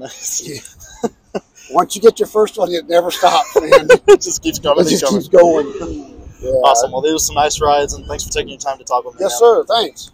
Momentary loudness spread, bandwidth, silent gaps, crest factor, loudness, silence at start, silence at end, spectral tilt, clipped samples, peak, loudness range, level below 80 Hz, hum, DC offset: 15 LU; 16.5 kHz; none; 14 dB; -14 LUFS; 0 s; 0.05 s; -3 dB/octave; 0.4%; 0 dBFS; 4 LU; -40 dBFS; none; under 0.1%